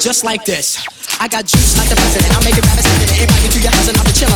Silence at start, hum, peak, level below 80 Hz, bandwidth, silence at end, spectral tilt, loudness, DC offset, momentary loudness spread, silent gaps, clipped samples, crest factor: 0 s; none; 0 dBFS; -16 dBFS; 19 kHz; 0 s; -3.5 dB/octave; -11 LUFS; under 0.1%; 6 LU; none; under 0.1%; 12 dB